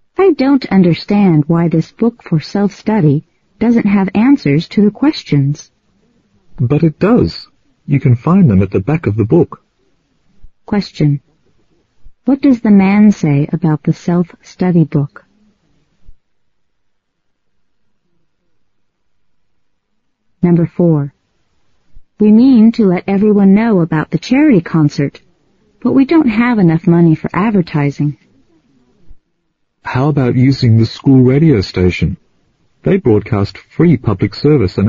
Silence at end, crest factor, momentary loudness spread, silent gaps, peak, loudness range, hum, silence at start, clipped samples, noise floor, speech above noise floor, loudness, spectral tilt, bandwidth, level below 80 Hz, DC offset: 0 s; 12 dB; 9 LU; none; 0 dBFS; 7 LU; none; 0.2 s; under 0.1%; -68 dBFS; 57 dB; -12 LUFS; -8 dB/octave; 7.2 kHz; -42 dBFS; under 0.1%